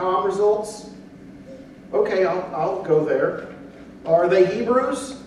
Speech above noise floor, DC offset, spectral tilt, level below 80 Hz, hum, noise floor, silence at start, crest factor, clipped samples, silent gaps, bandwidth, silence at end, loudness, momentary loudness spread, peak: 21 dB; under 0.1%; -6 dB/octave; -58 dBFS; none; -41 dBFS; 0 s; 18 dB; under 0.1%; none; 12 kHz; 0 s; -21 LUFS; 23 LU; -4 dBFS